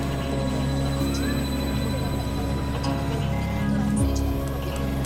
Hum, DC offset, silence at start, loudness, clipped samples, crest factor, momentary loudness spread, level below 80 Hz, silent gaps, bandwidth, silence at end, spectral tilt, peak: none; under 0.1%; 0 s; -26 LUFS; under 0.1%; 14 dB; 4 LU; -30 dBFS; none; 16.5 kHz; 0 s; -6 dB/octave; -10 dBFS